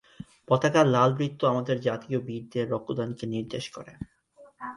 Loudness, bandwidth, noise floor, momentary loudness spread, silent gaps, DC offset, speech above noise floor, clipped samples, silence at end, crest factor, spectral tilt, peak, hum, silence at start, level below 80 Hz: -27 LUFS; 11.5 kHz; -52 dBFS; 21 LU; none; under 0.1%; 26 dB; under 0.1%; 0 s; 20 dB; -6.5 dB/octave; -8 dBFS; none; 0.2 s; -62 dBFS